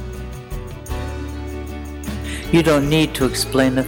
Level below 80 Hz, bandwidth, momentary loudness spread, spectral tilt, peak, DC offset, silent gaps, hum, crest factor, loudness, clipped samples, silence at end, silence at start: -32 dBFS; 18.5 kHz; 16 LU; -5 dB/octave; -2 dBFS; under 0.1%; none; none; 18 dB; -20 LUFS; under 0.1%; 0 s; 0 s